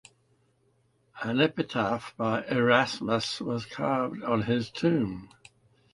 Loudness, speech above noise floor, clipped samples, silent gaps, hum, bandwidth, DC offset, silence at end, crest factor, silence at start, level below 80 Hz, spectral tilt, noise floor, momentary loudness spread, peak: -28 LUFS; 41 dB; under 0.1%; none; none; 11.5 kHz; under 0.1%; 0.65 s; 22 dB; 1.15 s; -62 dBFS; -6 dB/octave; -69 dBFS; 9 LU; -8 dBFS